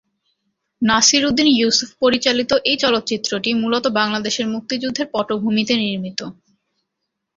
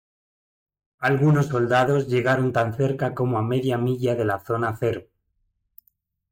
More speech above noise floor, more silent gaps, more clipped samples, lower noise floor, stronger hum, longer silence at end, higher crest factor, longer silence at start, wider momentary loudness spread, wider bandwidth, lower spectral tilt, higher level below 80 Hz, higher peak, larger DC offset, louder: first, 60 dB vs 50 dB; neither; neither; first, -78 dBFS vs -72 dBFS; neither; second, 1.05 s vs 1.3 s; about the same, 18 dB vs 14 dB; second, 0.8 s vs 1 s; first, 9 LU vs 6 LU; second, 7.8 kHz vs 16.5 kHz; second, -2.5 dB/octave vs -7.5 dB/octave; about the same, -54 dBFS vs -58 dBFS; first, -2 dBFS vs -10 dBFS; neither; first, -17 LUFS vs -22 LUFS